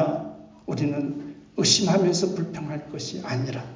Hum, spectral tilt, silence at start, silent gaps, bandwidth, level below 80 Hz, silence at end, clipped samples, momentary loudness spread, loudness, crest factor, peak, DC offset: none; -4 dB/octave; 0 s; none; 7.8 kHz; -60 dBFS; 0 s; under 0.1%; 16 LU; -25 LUFS; 20 dB; -6 dBFS; under 0.1%